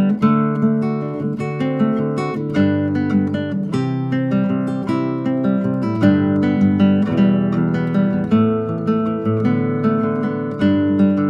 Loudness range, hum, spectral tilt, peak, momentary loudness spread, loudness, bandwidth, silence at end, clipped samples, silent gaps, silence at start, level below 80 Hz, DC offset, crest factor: 3 LU; none; -9.5 dB/octave; -2 dBFS; 6 LU; -18 LUFS; 7.2 kHz; 0 s; under 0.1%; none; 0 s; -54 dBFS; under 0.1%; 14 dB